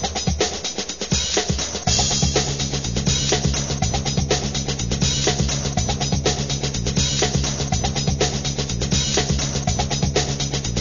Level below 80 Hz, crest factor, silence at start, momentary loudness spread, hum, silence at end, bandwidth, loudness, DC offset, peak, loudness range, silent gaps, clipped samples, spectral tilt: -30 dBFS; 16 dB; 0 s; 4 LU; none; 0 s; 7.4 kHz; -21 LUFS; 0.6%; -6 dBFS; 1 LU; none; under 0.1%; -3.5 dB/octave